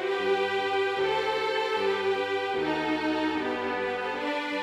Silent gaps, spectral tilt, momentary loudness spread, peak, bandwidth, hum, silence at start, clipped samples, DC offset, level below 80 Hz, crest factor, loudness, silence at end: none; -4.5 dB/octave; 3 LU; -16 dBFS; 12 kHz; none; 0 s; under 0.1%; under 0.1%; -62 dBFS; 12 dB; -28 LUFS; 0 s